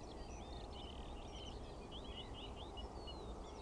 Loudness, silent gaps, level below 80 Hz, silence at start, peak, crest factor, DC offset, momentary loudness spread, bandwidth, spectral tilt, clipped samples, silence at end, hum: -51 LUFS; none; -54 dBFS; 0 s; -36 dBFS; 14 dB; under 0.1%; 2 LU; 10.5 kHz; -5 dB/octave; under 0.1%; 0 s; none